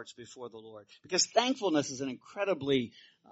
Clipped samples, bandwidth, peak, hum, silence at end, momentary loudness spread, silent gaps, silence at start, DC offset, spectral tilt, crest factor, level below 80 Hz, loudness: under 0.1%; 8 kHz; -12 dBFS; none; 0.3 s; 19 LU; none; 0 s; under 0.1%; -3 dB/octave; 22 dB; -74 dBFS; -31 LUFS